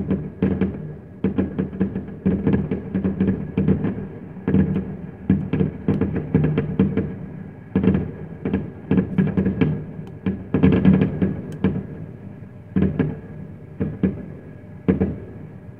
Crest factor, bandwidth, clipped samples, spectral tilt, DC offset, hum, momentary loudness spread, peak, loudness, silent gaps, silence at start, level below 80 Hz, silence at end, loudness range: 20 dB; 3.7 kHz; under 0.1%; -11 dB/octave; 0.3%; none; 15 LU; -2 dBFS; -22 LUFS; none; 0 s; -40 dBFS; 0 s; 5 LU